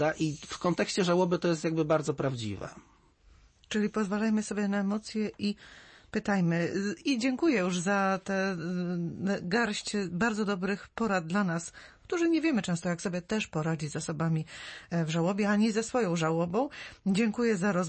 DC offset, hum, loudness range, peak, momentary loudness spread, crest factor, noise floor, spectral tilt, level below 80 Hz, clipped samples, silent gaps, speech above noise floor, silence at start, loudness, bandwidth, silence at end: under 0.1%; none; 2 LU; -14 dBFS; 8 LU; 16 dB; -60 dBFS; -5.5 dB/octave; -62 dBFS; under 0.1%; none; 30 dB; 0 s; -30 LUFS; 8.8 kHz; 0 s